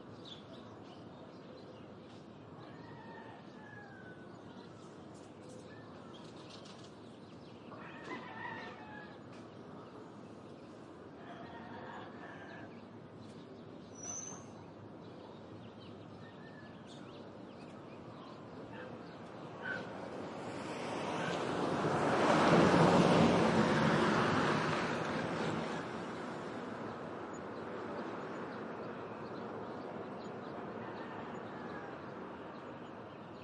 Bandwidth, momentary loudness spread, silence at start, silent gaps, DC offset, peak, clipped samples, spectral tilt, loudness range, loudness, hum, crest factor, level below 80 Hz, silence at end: 11 kHz; 22 LU; 0 s; none; under 0.1%; -16 dBFS; under 0.1%; -5.5 dB/octave; 22 LU; -36 LUFS; none; 24 dB; -70 dBFS; 0 s